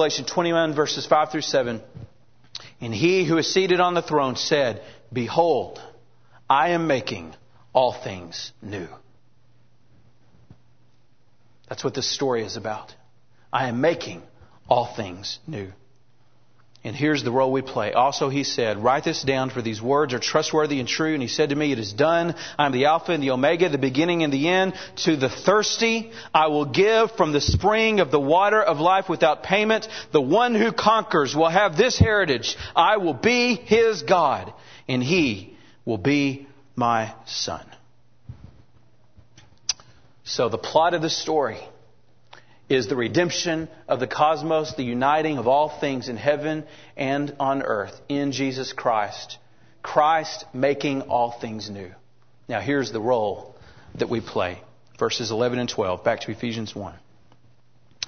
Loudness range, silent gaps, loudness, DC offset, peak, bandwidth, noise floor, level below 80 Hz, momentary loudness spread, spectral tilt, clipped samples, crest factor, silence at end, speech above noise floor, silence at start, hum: 9 LU; none; -22 LUFS; 0.3%; -2 dBFS; 6.6 kHz; -63 dBFS; -50 dBFS; 15 LU; -4.5 dB/octave; under 0.1%; 22 dB; 0 s; 41 dB; 0 s; none